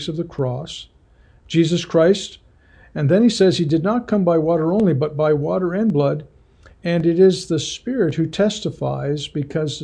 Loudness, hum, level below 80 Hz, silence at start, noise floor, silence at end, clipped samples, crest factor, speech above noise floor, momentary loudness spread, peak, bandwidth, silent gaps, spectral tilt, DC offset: -19 LUFS; none; -50 dBFS; 0 s; -51 dBFS; 0 s; under 0.1%; 14 dB; 33 dB; 9 LU; -4 dBFS; 10 kHz; none; -6.5 dB/octave; under 0.1%